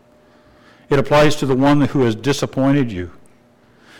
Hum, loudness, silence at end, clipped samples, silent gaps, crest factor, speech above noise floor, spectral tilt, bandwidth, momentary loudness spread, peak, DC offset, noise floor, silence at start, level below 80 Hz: none; -16 LUFS; 0 s; under 0.1%; none; 10 dB; 36 dB; -6 dB/octave; 15.5 kHz; 8 LU; -8 dBFS; under 0.1%; -51 dBFS; 0.9 s; -42 dBFS